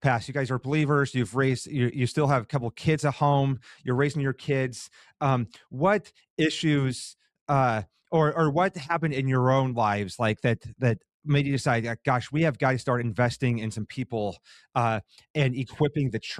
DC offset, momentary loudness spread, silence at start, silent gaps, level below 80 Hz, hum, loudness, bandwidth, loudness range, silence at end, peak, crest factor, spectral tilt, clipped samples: under 0.1%; 9 LU; 0 s; 6.30-6.37 s, 7.41-7.46 s, 11.14-11.20 s, 15.30-15.34 s; -58 dBFS; none; -26 LUFS; 11.5 kHz; 2 LU; 0 s; -8 dBFS; 18 dB; -6.5 dB/octave; under 0.1%